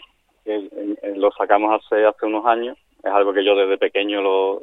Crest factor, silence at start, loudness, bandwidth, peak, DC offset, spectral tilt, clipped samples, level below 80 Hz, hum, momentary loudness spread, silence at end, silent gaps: 18 dB; 0.45 s; -19 LUFS; 4 kHz; 0 dBFS; under 0.1%; -6 dB/octave; under 0.1%; -68 dBFS; none; 11 LU; 0 s; none